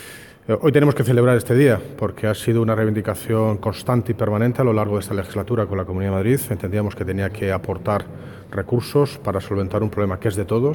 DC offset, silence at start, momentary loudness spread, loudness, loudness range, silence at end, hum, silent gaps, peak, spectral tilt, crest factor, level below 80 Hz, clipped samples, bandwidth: under 0.1%; 0 s; 9 LU; -20 LUFS; 5 LU; 0 s; none; none; -2 dBFS; -7.5 dB/octave; 18 dB; -48 dBFS; under 0.1%; 17.5 kHz